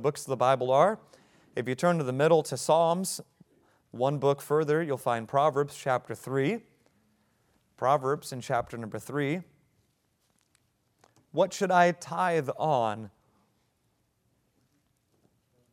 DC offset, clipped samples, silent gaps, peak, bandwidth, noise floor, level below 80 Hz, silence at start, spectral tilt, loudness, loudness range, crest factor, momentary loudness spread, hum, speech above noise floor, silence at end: under 0.1%; under 0.1%; none; -8 dBFS; 17 kHz; -73 dBFS; -72 dBFS; 0 s; -5.5 dB/octave; -28 LUFS; 7 LU; 22 dB; 12 LU; none; 46 dB; 2.65 s